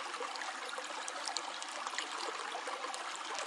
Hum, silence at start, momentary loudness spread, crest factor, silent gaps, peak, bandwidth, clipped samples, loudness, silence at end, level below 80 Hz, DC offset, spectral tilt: none; 0 s; 2 LU; 26 dB; none; -16 dBFS; 11.5 kHz; under 0.1%; -40 LUFS; 0 s; under -90 dBFS; under 0.1%; 1.5 dB/octave